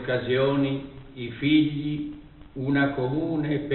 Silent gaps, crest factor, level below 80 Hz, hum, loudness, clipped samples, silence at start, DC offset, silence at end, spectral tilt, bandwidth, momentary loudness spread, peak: none; 16 dB; -50 dBFS; none; -25 LUFS; under 0.1%; 0 s; under 0.1%; 0 s; -5.5 dB/octave; 4.3 kHz; 16 LU; -10 dBFS